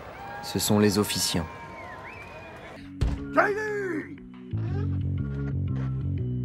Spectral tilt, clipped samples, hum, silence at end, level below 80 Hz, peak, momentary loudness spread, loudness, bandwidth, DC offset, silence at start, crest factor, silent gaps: -5 dB/octave; under 0.1%; none; 0 s; -42 dBFS; -6 dBFS; 18 LU; -27 LUFS; 16 kHz; under 0.1%; 0 s; 22 dB; none